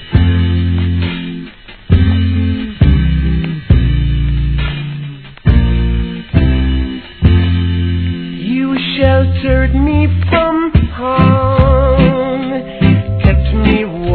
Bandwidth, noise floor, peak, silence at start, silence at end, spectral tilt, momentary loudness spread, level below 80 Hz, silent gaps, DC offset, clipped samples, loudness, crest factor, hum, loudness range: 4.5 kHz; -31 dBFS; 0 dBFS; 0 s; 0 s; -11 dB/octave; 8 LU; -18 dBFS; none; 0.3%; 0.2%; -13 LUFS; 12 dB; none; 3 LU